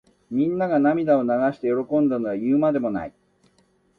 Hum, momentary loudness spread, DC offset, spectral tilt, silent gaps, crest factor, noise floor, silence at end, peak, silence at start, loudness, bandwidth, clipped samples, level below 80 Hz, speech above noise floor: none; 8 LU; under 0.1%; -10 dB/octave; none; 14 dB; -63 dBFS; 0.9 s; -8 dBFS; 0.3 s; -22 LUFS; 4.8 kHz; under 0.1%; -62 dBFS; 42 dB